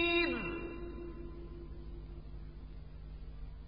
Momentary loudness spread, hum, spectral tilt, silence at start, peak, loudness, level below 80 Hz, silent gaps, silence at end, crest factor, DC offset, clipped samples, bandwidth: 18 LU; none; -8.5 dB/octave; 0 s; -20 dBFS; -41 LUFS; -48 dBFS; none; 0 s; 20 dB; 0.1%; under 0.1%; 5.2 kHz